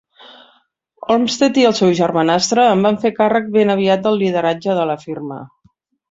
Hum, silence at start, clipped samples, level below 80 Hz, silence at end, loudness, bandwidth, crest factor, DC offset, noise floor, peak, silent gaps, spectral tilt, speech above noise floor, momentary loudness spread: none; 1.1 s; under 0.1%; -58 dBFS; 0.65 s; -15 LUFS; 8 kHz; 14 dB; under 0.1%; -59 dBFS; -2 dBFS; none; -5 dB/octave; 44 dB; 13 LU